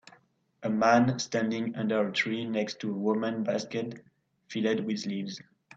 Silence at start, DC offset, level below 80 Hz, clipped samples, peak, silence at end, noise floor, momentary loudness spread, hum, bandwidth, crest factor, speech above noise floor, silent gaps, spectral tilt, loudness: 0.6 s; under 0.1%; -70 dBFS; under 0.1%; -10 dBFS; 0.4 s; -63 dBFS; 14 LU; none; 7.8 kHz; 20 dB; 34 dB; none; -5.5 dB/octave; -29 LUFS